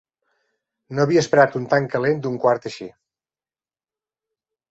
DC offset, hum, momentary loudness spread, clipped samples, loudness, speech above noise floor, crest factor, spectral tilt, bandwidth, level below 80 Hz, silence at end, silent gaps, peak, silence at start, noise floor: under 0.1%; none; 16 LU; under 0.1%; -19 LUFS; over 71 dB; 22 dB; -6 dB/octave; 8 kHz; -62 dBFS; 1.8 s; none; -2 dBFS; 0.9 s; under -90 dBFS